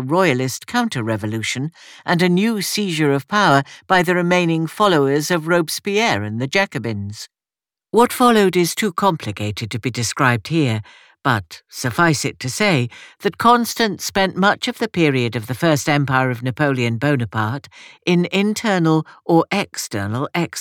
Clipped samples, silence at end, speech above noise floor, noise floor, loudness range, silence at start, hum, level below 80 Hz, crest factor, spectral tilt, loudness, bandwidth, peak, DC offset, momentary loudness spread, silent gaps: under 0.1%; 0 s; over 72 dB; under -90 dBFS; 3 LU; 0 s; none; -58 dBFS; 16 dB; -5 dB/octave; -18 LUFS; 19 kHz; -2 dBFS; under 0.1%; 10 LU; none